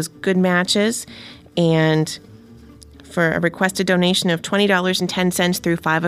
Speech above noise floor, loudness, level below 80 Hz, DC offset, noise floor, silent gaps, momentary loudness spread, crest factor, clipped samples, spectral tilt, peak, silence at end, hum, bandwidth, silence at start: 25 dB; -18 LUFS; -52 dBFS; under 0.1%; -43 dBFS; none; 11 LU; 16 dB; under 0.1%; -4.5 dB/octave; -2 dBFS; 0 s; none; 15.5 kHz; 0 s